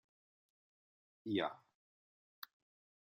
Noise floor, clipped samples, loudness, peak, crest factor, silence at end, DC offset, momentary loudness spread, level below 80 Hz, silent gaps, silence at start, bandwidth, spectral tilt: under -90 dBFS; under 0.1%; -41 LUFS; -24 dBFS; 24 dB; 1.55 s; under 0.1%; 16 LU; -90 dBFS; none; 1.25 s; 13.5 kHz; -6.5 dB/octave